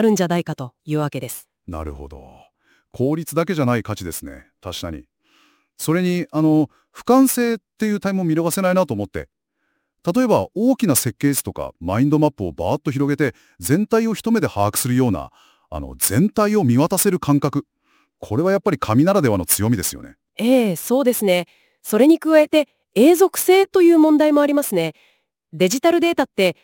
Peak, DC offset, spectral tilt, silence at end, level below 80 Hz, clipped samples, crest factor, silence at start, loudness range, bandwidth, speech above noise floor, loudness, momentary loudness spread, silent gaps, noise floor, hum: 0 dBFS; under 0.1%; -5.5 dB/octave; 0.1 s; -48 dBFS; under 0.1%; 18 dB; 0 s; 9 LU; 17 kHz; 54 dB; -18 LUFS; 17 LU; none; -72 dBFS; none